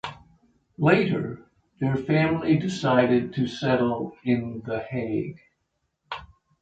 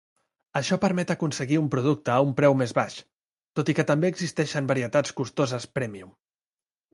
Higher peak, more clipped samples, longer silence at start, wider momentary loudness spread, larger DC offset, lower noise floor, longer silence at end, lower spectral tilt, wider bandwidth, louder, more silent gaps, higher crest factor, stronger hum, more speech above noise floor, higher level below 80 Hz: about the same, -4 dBFS vs -6 dBFS; neither; second, 0.05 s vs 0.55 s; first, 17 LU vs 11 LU; neither; second, -76 dBFS vs under -90 dBFS; second, 0.35 s vs 0.85 s; first, -7.5 dB/octave vs -6 dB/octave; second, 8.6 kHz vs 11.5 kHz; about the same, -24 LUFS vs -25 LUFS; second, none vs 3.16-3.34 s, 3.43-3.47 s; about the same, 20 dB vs 20 dB; neither; second, 53 dB vs over 65 dB; first, -56 dBFS vs -64 dBFS